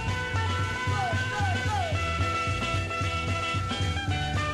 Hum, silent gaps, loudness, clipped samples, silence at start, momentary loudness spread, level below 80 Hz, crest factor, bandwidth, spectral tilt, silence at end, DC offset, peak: none; none; -28 LUFS; under 0.1%; 0 s; 2 LU; -40 dBFS; 12 dB; 12 kHz; -4.5 dB/octave; 0 s; under 0.1%; -16 dBFS